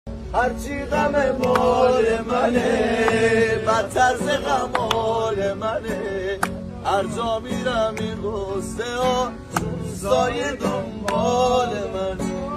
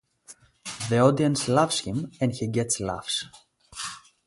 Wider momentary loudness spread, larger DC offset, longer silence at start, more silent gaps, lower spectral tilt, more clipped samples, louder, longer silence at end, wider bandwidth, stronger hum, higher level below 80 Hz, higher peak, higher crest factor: second, 9 LU vs 16 LU; neither; second, 0.05 s vs 0.3 s; neither; about the same, -5 dB/octave vs -4.5 dB/octave; neither; first, -22 LUFS vs -25 LUFS; second, 0 s vs 0.3 s; first, 14.5 kHz vs 11.5 kHz; neither; first, -40 dBFS vs -56 dBFS; first, -2 dBFS vs -6 dBFS; about the same, 20 dB vs 22 dB